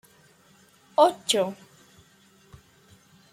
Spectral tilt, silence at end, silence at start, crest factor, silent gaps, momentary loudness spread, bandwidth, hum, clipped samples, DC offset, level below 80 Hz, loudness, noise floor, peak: -3 dB/octave; 1.8 s; 1 s; 24 dB; none; 12 LU; 16 kHz; none; under 0.1%; under 0.1%; -70 dBFS; -24 LUFS; -58 dBFS; -6 dBFS